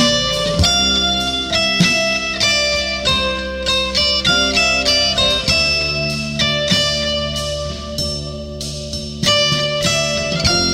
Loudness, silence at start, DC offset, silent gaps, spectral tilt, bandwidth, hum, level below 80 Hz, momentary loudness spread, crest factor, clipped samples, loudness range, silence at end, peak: -15 LUFS; 0 s; under 0.1%; none; -2.5 dB/octave; 16.5 kHz; none; -32 dBFS; 9 LU; 14 dB; under 0.1%; 4 LU; 0 s; -2 dBFS